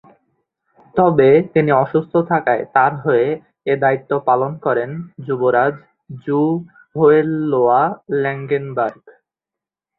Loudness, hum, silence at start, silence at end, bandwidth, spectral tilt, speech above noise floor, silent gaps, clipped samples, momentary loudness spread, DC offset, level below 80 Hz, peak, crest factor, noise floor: -17 LUFS; none; 0.95 s; 0.9 s; 4.2 kHz; -11 dB/octave; 71 dB; none; under 0.1%; 12 LU; under 0.1%; -58 dBFS; -2 dBFS; 16 dB; -87 dBFS